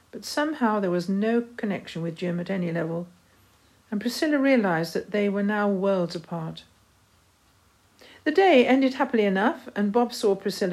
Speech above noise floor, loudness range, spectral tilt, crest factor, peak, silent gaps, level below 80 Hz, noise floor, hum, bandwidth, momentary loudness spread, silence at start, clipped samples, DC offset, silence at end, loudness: 37 dB; 6 LU; -6 dB/octave; 18 dB; -6 dBFS; none; -68 dBFS; -61 dBFS; none; 15 kHz; 11 LU; 0.15 s; under 0.1%; under 0.1%; 0 s; -25 LUFS